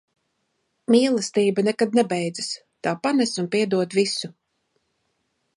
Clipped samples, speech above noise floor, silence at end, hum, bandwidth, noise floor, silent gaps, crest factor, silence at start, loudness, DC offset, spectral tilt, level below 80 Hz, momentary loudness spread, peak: under 0.1%; 52 dB; 1.3 s; none; 11.5 kHz; -73 dBFS; none; 18 dB; 0.9 s; -22 LUFS; under 0.1%; -4.5 dB/octave; -74 dBFS; 10 LU; -6 dBFS